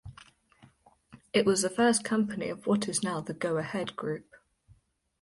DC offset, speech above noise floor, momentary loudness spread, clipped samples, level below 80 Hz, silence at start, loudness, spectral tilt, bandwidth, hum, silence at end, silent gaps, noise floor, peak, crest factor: under 0.1%; 35 dB; 11 LU; under 0.1%; -64 dBFS; 0.05 s; -29 LUFS; -4 dB/octave; 11.5 kHz; none; 1 s; none; -64 dBFS; -12 dBFS; 18 dB